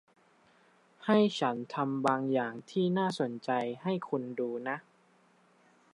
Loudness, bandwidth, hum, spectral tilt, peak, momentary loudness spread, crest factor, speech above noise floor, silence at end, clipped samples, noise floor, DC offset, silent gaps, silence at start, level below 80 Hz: -32 LUFS; 11.5 kHz; none; -6.5 dB/octave; -14 dBFS; 9 LU; 20 dB; 35 dB; 1.15 s; under 0.1%; -66 dBFS; under 0.1%; none; 1 s; -84 dBFS